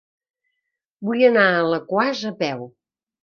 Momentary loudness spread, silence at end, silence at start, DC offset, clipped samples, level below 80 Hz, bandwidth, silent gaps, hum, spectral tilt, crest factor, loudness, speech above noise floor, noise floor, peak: 12 LU; 0.55 s; 1 s; under 0.1%; under 0.1%; -70 dBFS; 6.8 kHz; none; none; -5.5 dB/octave; 20 dB; -19 LUFS; 60 dB; -80 dBFS; -2 dBFS